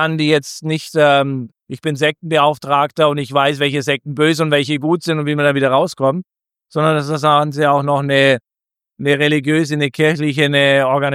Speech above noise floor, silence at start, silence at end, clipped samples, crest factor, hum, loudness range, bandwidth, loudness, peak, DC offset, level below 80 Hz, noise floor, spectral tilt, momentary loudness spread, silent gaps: 71 dB; 0 s; 0 s; under 0.1%; 14 dB; none; 1 LU; 15 kHz; -15 LUFS; 0 dBFS; under 0.1%; -62 dBFS; -86 dBFS; -5.5 dB/octave; 7 LU; none